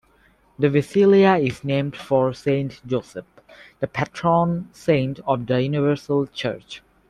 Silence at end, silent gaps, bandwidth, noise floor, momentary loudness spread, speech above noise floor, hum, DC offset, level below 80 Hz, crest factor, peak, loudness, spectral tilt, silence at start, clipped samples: 0.3 s; none; 11.5 kHz; -58 dBFS; 12 LU; 37 dB; none; under 0.1%; -56 dBFS; 16 dB; -4 dBFS; -21 LUFS; -7.5 dB/octave; 0.6 s; under 0.1%